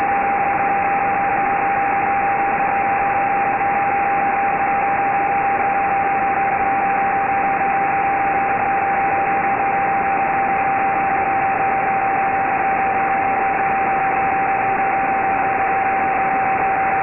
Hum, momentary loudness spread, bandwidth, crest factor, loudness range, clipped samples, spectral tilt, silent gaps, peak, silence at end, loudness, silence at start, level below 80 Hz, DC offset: none; 0 LU; 3 kHz; 10 dB; 0 LU; under 0.1%; -9 dB/octave; none; -8 dBFS; 0 s; -18 LUFS; 0 s; -46 dBFS; under 0.1%